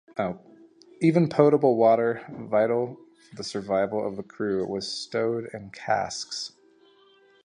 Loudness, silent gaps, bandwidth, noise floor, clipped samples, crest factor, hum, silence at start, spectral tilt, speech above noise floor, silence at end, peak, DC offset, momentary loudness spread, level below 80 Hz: -25 LUFS; none; 10.5 kHz; -58 dBFS; under 0.1%; 22 dB; none; 0.15 s; -6 dB/octave; 34 dB; 0.95 s; -4 dBFS; under 0.1%; 15 LU; -66 dBFS